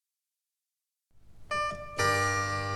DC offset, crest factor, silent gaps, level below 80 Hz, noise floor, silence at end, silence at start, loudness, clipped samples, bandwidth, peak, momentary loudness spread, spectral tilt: under 0.1%; 18 dB; none; -56 dBFS; -89 dBFS; 0 s; 1.2 s; -29 LUFS; under 0.1%; 13.5 kHz; -14 dBFS; 8 LU; -3.5 dB/octave